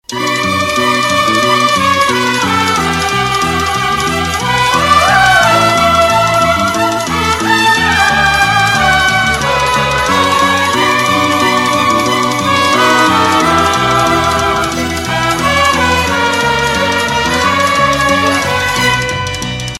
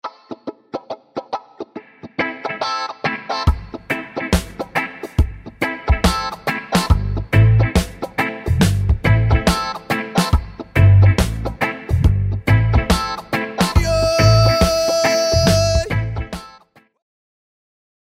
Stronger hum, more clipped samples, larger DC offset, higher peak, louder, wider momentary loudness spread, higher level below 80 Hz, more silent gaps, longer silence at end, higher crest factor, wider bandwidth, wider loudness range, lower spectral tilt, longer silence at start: neither; neither; first, 0.3% vs under 0.1%; about the same, 0 dBFS vs 0 dBFS; first, -10 LUFS vs -18 LUFS; second, 4 LU vs 17 LU; second, -32 dBFS vs -26 dBFS; neither; second, 0 s vs 1.55 s; about the same, 12 dB vs 16 dB; about the same, 16.5 kHz vs 16 kHz; second, 2 LU vs 7 LU; second, -3 dB/octave vs -5.5 dB/octave; about the same, 0.1 s vs 0.05 s